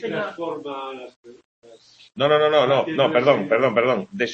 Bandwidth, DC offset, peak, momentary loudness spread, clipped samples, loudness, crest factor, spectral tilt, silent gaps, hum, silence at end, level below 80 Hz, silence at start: 7.4 kHz; under 0.1%; -2 dBFS; 15 LU; under 0.1%; -20 LUFS; 20 dB; -6 dB/octave; 1.16-1.23 s, 1.45-1.62 s; none; 0 s; -66 dBFS; 0 s